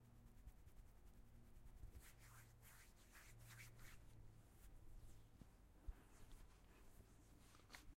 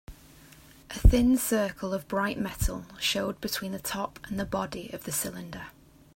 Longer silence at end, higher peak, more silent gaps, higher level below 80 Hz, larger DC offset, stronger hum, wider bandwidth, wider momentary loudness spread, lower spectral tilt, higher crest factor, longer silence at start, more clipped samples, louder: second, 0 s vs 0.45 s; second, -42 dBFS vs -6 dBFS; neither; second, -66 dBFS vs -34 dBFS; neither; neither; about the same, 16 kHz vs 16.5 kHz; second, 6 LU vs 14 LU; about the same, -4 dB/octave vs -4.5 dB/octave; about the same, 22 dB vs 24 dB; about the same, 0 s vs 0.1 s; neither; second, -66 LUFS vs -29 LUFS